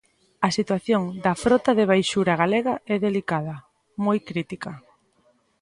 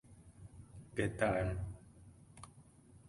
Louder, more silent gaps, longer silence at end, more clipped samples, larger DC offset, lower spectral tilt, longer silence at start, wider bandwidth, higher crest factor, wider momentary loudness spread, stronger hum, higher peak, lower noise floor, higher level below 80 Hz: first, -23 LUFS vs -38 LUFS; neither; first, 0.8 s vs 0.1 s; neither; neither; about the same, -5.5 dB/octave vs -6.5 dB/octave; first, 0.4 s vs 0.1 s; about the same, 11.5 kHz vs 11.5 kHz; about the same, 20 dB vs 24 dB; second, 15 LU vs 25 LU; neither; first, -4 dBFS vs -18 dBFS; about the same, -64 dBFS vs -61 dBFS; about the same, -58 dBFS vs -54 dBFS